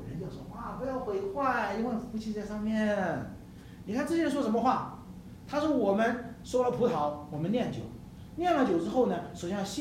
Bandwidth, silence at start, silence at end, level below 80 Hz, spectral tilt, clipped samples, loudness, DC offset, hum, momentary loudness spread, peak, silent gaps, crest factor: 15.5 kHz; 0 s; 0 s; -56 dBFS; -6 dB/octave; under 0.1%; -31 LUFS; under 0.1%; none; 15 LU; -12 dBFS; none; 18 dB